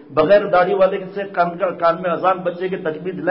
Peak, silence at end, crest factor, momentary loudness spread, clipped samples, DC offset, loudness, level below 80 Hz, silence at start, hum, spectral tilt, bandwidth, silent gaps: -4 dBFS; 0 s; 14 dB; 10 LU; under 0.1%; under 0.1%; -18 LUFS; -56 dBFS; 0.1 s; none; -11 dB/octave; 5.6 kHz; none